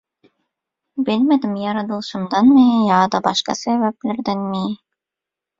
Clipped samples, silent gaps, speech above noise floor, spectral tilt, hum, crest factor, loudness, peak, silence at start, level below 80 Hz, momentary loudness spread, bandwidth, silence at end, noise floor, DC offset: under 0.1%; none; 69 dB; -5.5 dB/octave; none; 16 dB; -17 LUFS; -2 dBFS; 0.95 s; -60 dBFS; 12 LU; 7.6 kHz; 0.85 s; -86 dBFS; under 0.1%